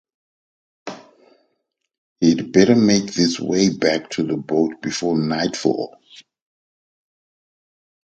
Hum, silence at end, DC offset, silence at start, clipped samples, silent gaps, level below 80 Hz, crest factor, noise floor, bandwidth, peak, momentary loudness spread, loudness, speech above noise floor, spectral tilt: none; 2.2 s; under 0.1%; 0.85 s; under 0.1%; 1.98-2.16 s; -58 dBFS; 20 dB; -74 dBFS; 8.8 kHz; 0 dBFS; 16 LU; -19 LUFS; 56 dB; -5 dB/octave